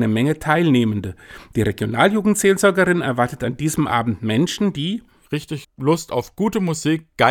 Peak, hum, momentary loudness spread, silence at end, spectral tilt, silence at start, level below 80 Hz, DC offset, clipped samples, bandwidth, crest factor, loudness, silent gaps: 0 dBFS; none; 12 LU; 0 s; -5.5 dB/octave; 0 s; -48 dBFS; under 0.1%; under 0.1%; 18.5 kHz; 18 dB; -19 LUFS; none